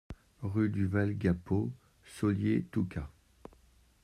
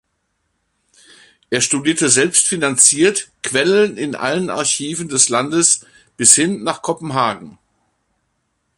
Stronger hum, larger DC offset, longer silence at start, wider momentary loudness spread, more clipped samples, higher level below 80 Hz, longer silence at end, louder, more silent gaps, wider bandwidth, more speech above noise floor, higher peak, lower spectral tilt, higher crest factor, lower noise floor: neither; neither; second, 0.1 s vs 1.5 s; first, 19 LU vs 11 LU; neither; about the same, -56 dBFS vs -60 dBFS; second, 0.95 s vs 1.3 s; second, -33 LUFS vs -14 LUFS; neither; about the same, 12.5 kHz vs 13.5 kHz; second, 33 dB vs 53 dB; second, -16 dBFS vs 0 dBFS; first, -8.5 dB/octave vs -2 dB/octave; about the same, 18 dB vs 18 dB; second, -64 dBFS vs -69 dBFS